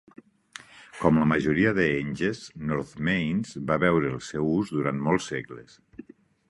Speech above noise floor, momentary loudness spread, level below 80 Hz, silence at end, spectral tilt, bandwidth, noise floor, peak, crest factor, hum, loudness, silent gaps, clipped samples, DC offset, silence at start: 23 dB; 22 LU; -52 dBFS; 0.9 s; -6.5 dB/octave; 11.5 kHz; -49 dBFS; -4 dBFS; 22 dB; none; -26 LUFS; none; under 0.1%; under 0.1%; 0.75 s